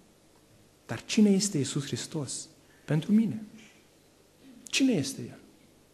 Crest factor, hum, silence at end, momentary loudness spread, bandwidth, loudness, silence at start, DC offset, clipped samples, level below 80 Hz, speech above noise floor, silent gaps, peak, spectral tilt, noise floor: 18 dB; 50 Hz at -55 dBFS; 0.6 s; 19 LU; 13 kHz; -28 LUFS; 0.9 s; under 0.1%; under 0.1%; -70 dBFS; 33 dB; none; -14 dBFS; -5 dB/octave; -61 dBFS